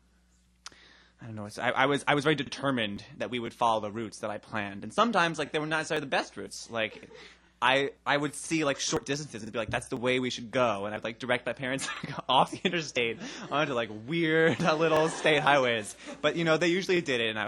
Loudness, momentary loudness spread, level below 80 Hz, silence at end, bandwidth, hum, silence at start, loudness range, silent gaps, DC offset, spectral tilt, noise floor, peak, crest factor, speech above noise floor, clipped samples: -29 LUFS; 11 LU; -64 dBFS; 0 s; 13 kHz; none; 1.2 s; 4 LU; none; under 0.1%; -4 dB/octave; -65 dBFS; -6 dBFS; 22 dB; 36 dB; under 0.1%